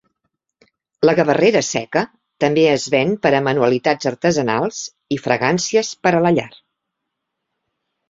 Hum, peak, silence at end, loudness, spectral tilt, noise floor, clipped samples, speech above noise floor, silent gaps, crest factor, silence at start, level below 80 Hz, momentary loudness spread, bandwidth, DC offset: none; -2 dBFS; 1.6 s; -17 LUFS; -4.5 dB/octave; -78 dBFS; under 0.1%; 61 dB; none; 18 dB; 1 s; -58 dBFS; 8 LU; 7.8 kHz; under 0.1%